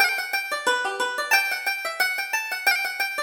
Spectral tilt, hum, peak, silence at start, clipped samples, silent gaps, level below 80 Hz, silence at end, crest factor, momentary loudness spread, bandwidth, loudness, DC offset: 1.5 dB/octave; none; -6 dBFS; 0 s; under 0.1%; none; -70 dBFS; 0 s; 20 dB; 5 LU; over 20 kHz; -23 LUFS; under 0.1%